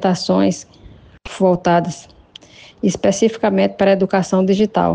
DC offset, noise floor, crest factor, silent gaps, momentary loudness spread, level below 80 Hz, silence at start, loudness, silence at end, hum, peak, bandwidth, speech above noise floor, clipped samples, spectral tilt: under 0.1%; -43 dBFS; 14 dB; none; 9 LU; -48 dBFS; 0 s; -16 LUFS; 0 s; none; -2 dBFS; 9.4 kHz; 27 dB; under 0.1%; -6 dB/octave